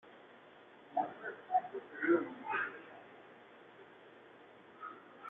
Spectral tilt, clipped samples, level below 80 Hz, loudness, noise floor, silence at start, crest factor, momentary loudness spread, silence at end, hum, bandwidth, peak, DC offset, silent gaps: -3 dB/octave; under 0.1%; -88 dBFS; -38 LUFS; -59 dBFS; 0.05 s; 22 dB; 25 LU; 0 s; none; 3.9 kHz; -20 dBFS; under 0.1%; none